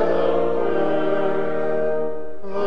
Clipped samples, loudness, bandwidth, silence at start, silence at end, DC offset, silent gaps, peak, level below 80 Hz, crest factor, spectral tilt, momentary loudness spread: under 0.1%; -22 LUFS; 6.6 kHz; 0 s; 0 s; 8%; none; -8 dBFS; -56 dBFS; 14 dB; -8 dB/octave; 8 LU